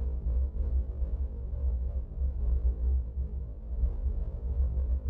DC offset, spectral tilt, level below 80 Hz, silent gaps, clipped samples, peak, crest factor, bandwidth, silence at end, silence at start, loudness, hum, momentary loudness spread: under 0.1%; -12 dB/octave; -30 dBFS; none; under 0.1%; -18 dBFS; 12 dB; 1.3 kHz; 0 s; 0 s; -34 LUFS; none; 6 LU